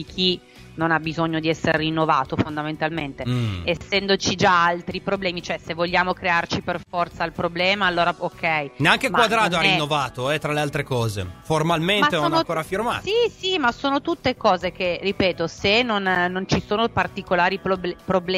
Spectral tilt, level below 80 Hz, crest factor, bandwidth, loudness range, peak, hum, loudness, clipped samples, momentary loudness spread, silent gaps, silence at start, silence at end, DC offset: -4.5 dB/octave; -48 dBFS; 22 dB; 16 kHz; 3 LU; 0 dBFS; none; -21 LUFS; under 0.1%; 8 LU; none; 0 s; 0 s; under 0.1%